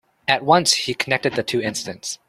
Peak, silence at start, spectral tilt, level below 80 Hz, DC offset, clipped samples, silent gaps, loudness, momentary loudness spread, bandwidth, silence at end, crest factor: 0 dBFS; 0.3 s; -2.5 dB/octave; -60 dBFS; under 0.1%; under 0.1%; none; -19 LUFS; 11 LU; 15.5 kHz; 0.15 s; 20 dB